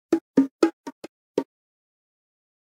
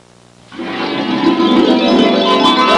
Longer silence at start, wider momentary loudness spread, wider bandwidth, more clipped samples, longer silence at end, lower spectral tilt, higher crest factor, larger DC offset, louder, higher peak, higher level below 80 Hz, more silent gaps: second, 0.1 s vs 0.5 s; first, 20 LU vs 10 LU; about the same, 12 kHz vs 11 kHz; neither; first, 1.25 s vs 0 s; about the same, -6 dB/octave vs -5 dB/octave; first, 24 dB vs 10 dB; neither; second, -25 LUFS vs -12 LUFS; about the same, -4 dBFS vs -2 dBFS; second, -76 dBFS vs -50 dBFS; first, 0.21-0.34 s, 0.51-0.59 s, 0.73-0.84 s, 0.92-1.02 s, 1.09-1.35 s vs none